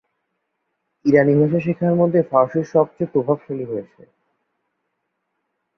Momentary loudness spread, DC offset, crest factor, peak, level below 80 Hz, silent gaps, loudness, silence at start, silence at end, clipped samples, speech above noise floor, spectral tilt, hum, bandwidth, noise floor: 12 LU; under 0.1%; 18 dB; -2 dBFS; -62 dBFS; none; -18 LUFS; 1.05 s; 1.95 s; under 0.1%; 57 dB; -10 dB/octave; none; 6.6 kHz; -75 dBFS